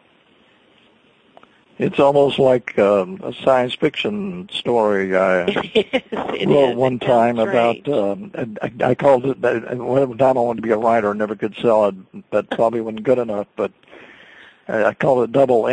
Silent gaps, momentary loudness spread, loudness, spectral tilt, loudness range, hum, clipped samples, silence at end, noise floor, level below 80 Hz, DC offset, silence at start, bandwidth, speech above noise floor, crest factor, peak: none; 10 LU; -18 LUFS; -6.5 dB/octave; 3 LU; none; under 0.1%; 0 s; -55 dBFS; -58 dBFS; under 0.1%; 1.8 s; 9.2 kHz; 37 dB; 16 dB; -2 dBFS